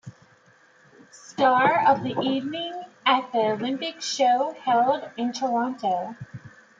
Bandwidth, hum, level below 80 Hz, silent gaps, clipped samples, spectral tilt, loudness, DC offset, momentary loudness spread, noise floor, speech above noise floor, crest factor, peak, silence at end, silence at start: 7.6 kHz; none; -72 dBFS; none; under 0.1%; -4 dB/octave; -24 LUFS; under 0.1%; 14 LU; -57 dBFS; 34 dB; 18 dB; -6 dBFS; 0.3 s; 0.05 s